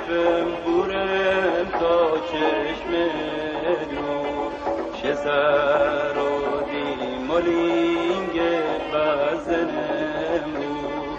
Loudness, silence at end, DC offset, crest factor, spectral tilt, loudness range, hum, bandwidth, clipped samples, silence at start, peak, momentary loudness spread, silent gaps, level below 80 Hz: -23 LUFS; 0 s; under 0.1%; 14 dB; -5.5 dB/octave; 2 LU; none; 7.8 kHz; under 0.1%; 0 s; -8 dBFS; 7 LU; none; -48 dBFS